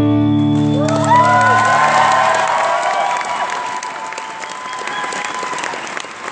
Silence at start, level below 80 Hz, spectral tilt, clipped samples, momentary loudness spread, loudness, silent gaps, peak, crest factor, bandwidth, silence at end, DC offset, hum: 0 s; -52 dBFS; -5 dB/octave; under 0.1%; 14 LU; -15 LUFS; none; 0 dBFS; 14 dB; 8 kHz; 0 s; under 0.1%; none